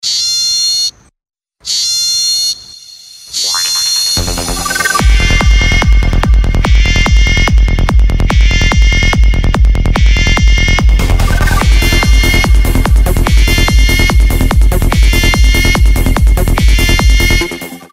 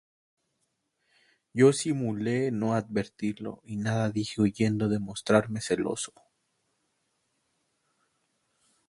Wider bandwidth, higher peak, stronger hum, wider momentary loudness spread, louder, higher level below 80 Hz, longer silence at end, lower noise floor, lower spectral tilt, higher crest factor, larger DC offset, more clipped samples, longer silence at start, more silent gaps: first, 16 kHz vs 11.5 kHz; first, 0 dBFS vs -6 dBFS; neither; second, 4 LU vs 11 LU; first, -10 LUFS vs -28 LUFS; first, -10 dBFS vs -62 dBFS; second, 0.15 s vs 2.8 s; second, -33 dBFS vs -78 dBFS; second, -3.5 dB/octave vs -6 dB/octave; second, 8 dB vs 24 dB; neither; neither; second, 0.05 s vs 1.55 s; neither